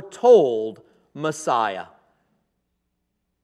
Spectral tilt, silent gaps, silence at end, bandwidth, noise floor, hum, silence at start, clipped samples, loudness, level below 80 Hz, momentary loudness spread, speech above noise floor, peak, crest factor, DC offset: -5 dB/octave; none; 1.6 s; 11.5 kHz; -75 dBFS; none; 0 s; under 0.1%; -20 LUFS; -78 dBFS; 16 LU; 56 dB; -4 dBFS; 18 dB; under 0.1%